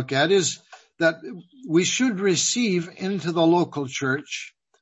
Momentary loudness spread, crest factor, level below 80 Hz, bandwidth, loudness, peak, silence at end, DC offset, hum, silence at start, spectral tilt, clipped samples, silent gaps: 16 LU; 18 dB; -70 dBFS; 8.4 kHz; -22 LUFS; -6 dBFS; 0.35 s; under 0.1%; none; 0 s; -3.5 dB/octave; under 0.1%; none